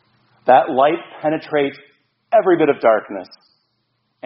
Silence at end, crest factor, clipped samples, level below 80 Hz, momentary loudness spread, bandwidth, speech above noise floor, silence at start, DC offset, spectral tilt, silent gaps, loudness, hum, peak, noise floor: 1 s; 18 dB; under 0.1%; -68 dBFS; 11 LU; 5.8 kHz; 53 dB; 0.45 s; under 0.1%; -4 dB/octave; none; -17 LUFS; none; 0 dBFS; -69 dBFS